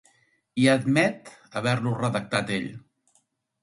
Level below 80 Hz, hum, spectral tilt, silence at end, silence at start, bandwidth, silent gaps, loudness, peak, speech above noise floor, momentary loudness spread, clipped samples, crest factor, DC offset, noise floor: -64 dBFS; none; -5.5 dB/octave; 0.85 s; 0.55 s; 11.5 kHz; none; -25 LUFS; -4 dBFS; 45 dB; 14 LU; under 0.1%; 22 dB; under 0.1%; -69 dBFS